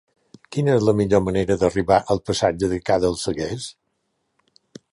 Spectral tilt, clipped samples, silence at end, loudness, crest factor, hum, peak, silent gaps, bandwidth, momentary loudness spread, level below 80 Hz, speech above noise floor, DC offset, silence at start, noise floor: -6 dB/octave; under 0.1%; 1.2 s; -21 LUFS; 18 dB; none; -2 dBFS; none; 11.5 kHz; 10 LU; -44 dBFS; 53 dB; under 0.1%; 0.5 s; -73 dBFS